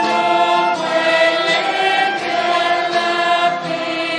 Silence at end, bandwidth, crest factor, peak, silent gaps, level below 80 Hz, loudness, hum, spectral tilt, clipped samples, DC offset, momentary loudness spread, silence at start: 0 s; 10.5 kHz; 14 dB; -2 dBFS; none; -74 dBFS; -16 LUFS; none; -3 dB/octave; under 0.1%; under 0.1%; 4 LU; 0 s